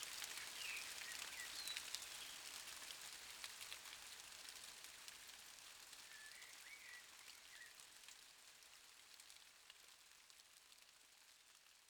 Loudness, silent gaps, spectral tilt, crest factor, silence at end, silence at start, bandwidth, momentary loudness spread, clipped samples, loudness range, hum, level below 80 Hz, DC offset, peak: -53 LUFS; none; 2 dB/octave; 34 dB; 0 s; 0 s; over 20 kHz; 16 LU; under 0.1%; 12 LU; none; -86 dBFS; under 0.1%; -22 dBFS